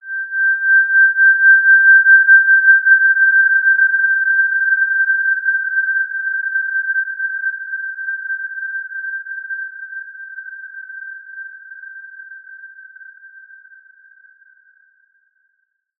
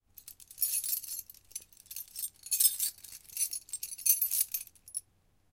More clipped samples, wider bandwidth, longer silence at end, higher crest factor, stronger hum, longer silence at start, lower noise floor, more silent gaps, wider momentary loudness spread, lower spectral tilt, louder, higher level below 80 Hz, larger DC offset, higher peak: neither; second, 1.8 kHz vs 17 kHz; first, 2.7 s vs 0.5 s; second, 14 dB vs 28 dB; neither; second, 0.05 s vs 0.25 s; about the same, -69 dBFS vs -70 dBFS; neither; first, 23 LU vs 19 LU; first, 1.5 dB/octave vs 3.5 dB/octave; first, -12 LUFS vs -31 LUFS; second, under -90 dBFS vs -72 dBFS; neither; first, -2 dBFS vs -8 dBFS